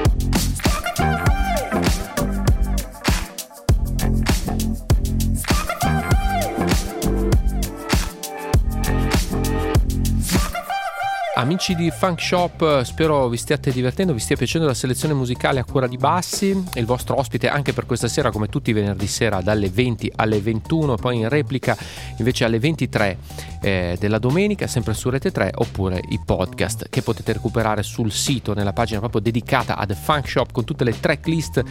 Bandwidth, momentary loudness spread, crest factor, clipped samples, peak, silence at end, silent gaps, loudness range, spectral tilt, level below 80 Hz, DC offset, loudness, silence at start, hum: 17 kHz; 4 LU; 20 dB; under 0.1%; 0 dBFS; 0 s; none; 2 LU; -5.5 dB/octave; -28 dBFS; under 0.1%; -21 LUFS; 0 s; none